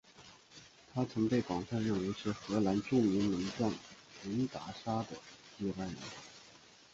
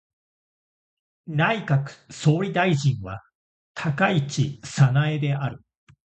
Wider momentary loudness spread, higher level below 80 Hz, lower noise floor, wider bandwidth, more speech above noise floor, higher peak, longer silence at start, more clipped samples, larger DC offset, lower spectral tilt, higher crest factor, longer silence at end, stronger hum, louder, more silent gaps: first, 23 LU vs 12 LU; second, -64 dBFS vs -56 dBFS; second, -60 dBFS vs under -90 dBFS; about the same, 8 kHz vs 8.6 kHz; second, 25 dB vs over 68 dB; second, -18 dBFS vs -6 dBFS; second, 0.2 s vs 1.25 s; neither; neither; about the same, -6.5 dB/octave vs -6.5 dB/octave; about the same, 18 dB vs 20 dB; second, 0.35 s vs 0.55 s; neither; second, -36 LUFS vs -23 LUFS; second, none vs 3.35-3.75 s